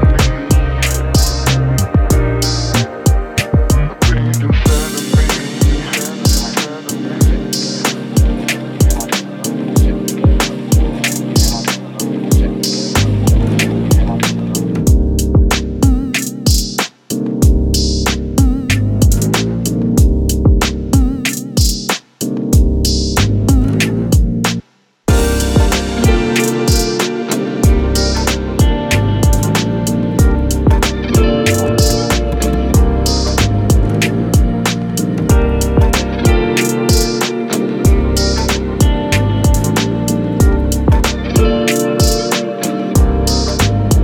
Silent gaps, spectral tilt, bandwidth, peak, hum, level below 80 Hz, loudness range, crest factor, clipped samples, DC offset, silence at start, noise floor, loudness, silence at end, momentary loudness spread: none; -5 dB/octave; 18.5 kHz; 0 dBFS; none; -16 dBFS; 2 LU; 12 dB; under 0.1%; under 0.1%; 0 s; -33 dBFS; -14 LUFS; 0 s; 4 LU